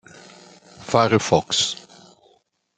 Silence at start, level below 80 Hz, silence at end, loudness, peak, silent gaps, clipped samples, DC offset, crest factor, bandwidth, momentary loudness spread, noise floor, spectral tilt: 0.8 s; -58 dBFS; 1 s; -19 LUFS; -2 dBFS; none; under 0.1%; under 0.1%; 22 dB; 9.6 kHz; 15 LU; -62 dBFS; -3.5 dB/octave